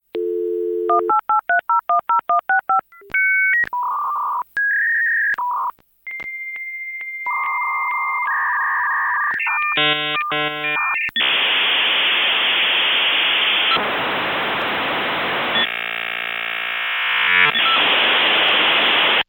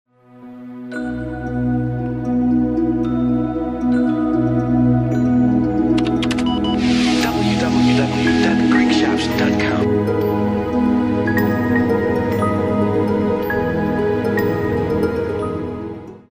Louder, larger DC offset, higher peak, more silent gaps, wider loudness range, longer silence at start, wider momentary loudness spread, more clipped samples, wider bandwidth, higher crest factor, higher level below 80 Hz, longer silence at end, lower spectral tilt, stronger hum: about the same, -17 LUFS vs -18 LUFS; neither; about the same, -4 dBFS vs -4 dBFS; neither; about the same, 6 LU vs 4 LU; second, 0.15 s vs 0.35 s; about the same, 9 LU vs 8 LU; neither; about the same, 17 kHz vs 15.5 kHz; about the same, 16 dB vs 14 dB; second, -64 dBFS vs -38 dBFS; about the same, 0.05 s vs 0.1 s; second, -3.5 dB/octave vs -6.5 dB/octave; neither